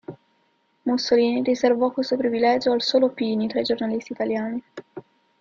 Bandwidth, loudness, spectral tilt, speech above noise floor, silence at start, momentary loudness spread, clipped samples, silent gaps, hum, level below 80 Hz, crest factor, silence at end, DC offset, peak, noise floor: 7.4 kHz; -22 LUFS; -5 dB/octave; 45 dB; 0.1 s; 17 LU; under 0.1%; none; none; -64 dBFS; 16 dB; 0.4 s; under 0.1%; -6 dBFS; -66 dBFS